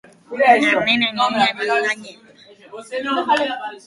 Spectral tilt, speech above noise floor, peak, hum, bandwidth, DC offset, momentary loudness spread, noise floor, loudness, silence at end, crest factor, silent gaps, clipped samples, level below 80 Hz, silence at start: -3 dB/octave; 26 dB; -2 dBFS; none; 11.5 kHz; under 0.1%; 14 LU; -45 dBFS; -17 LUFS; 0.1 s; 18 dB; none; under 0.1%; -62 dBFS; 0.3 s